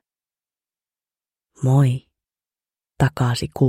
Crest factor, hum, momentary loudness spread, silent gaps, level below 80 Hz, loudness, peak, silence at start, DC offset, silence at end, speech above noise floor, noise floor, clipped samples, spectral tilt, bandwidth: 20 dB; none; 8 LU; none; -48 dBFS; -20 LUFS; -4 dBFS; 1.6 s; under 0.1%; 0 s; over 72 dB; under -90 dBFS; under 0.1%; -7 dB/octave; 14 kHz